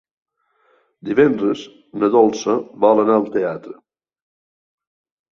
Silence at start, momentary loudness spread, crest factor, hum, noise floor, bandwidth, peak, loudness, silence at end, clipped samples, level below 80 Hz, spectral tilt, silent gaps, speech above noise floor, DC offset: 1.05 s; 14 LU; 18 dB; none; -61 dBFS; 7.2 kHz; -2 dBFS; -17 LUFS; 1.6 s; under 0.1%; -66 dBFS; -6 dB/octave; none; 44 dB; under 0.1%